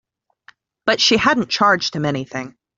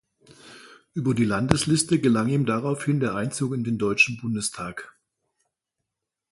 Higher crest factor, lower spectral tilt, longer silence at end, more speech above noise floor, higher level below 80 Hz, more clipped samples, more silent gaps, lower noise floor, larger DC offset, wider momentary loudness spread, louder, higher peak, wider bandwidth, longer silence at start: second, 18 dB vs 26 dB; second, -3.5 dB/octave vs -5 dB/octave; second, 0.25 s vs 1.4 s; second, 34 dB vs 62 dB; about the same, -54 dBFS vs -52 dBFS; neither; neither; second, -52 dBFS vs -85 dBFS; neither; first, 13 LU vs 9 LU; first, -17 LUFS vs -23 LUFS; about the same, -2 dBFS vs 0 dBFS; second, 7.8 kHz vs 11.5 kHz; first, 0.85 s vs 0.45 s